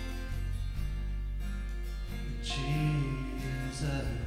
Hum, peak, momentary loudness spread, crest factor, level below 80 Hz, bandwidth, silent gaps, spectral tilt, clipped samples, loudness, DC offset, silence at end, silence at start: 50 Hz at -50 dBFS; -20 dBFS; 9 LU; 14 dB; -36 dBFS; 15 kHz; none; -6 dB/octave; under 0.1%; -36 LUFS; under 0.1%; 0 s; 0 s